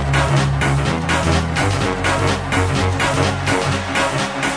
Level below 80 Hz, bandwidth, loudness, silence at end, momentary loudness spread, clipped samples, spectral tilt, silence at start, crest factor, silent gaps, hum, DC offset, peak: -30 dBFS; 11 kHz; -18 LUFS; 0 s; 2 LU; under 0.1%; -5 dB/octave; 0 s; 16 dB; none; none; under 0.1%; -2 dBFS